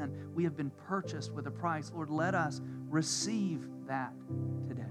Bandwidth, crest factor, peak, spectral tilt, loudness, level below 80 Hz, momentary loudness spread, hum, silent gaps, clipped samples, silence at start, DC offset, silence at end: 13.5 kHz; 16 dB; -20 dBFS; -5 dB/octave; -36 LUFS; -82 dBFS; 8 LU; none; none; under 0.1%; 0 s; under 0.1%; 0 s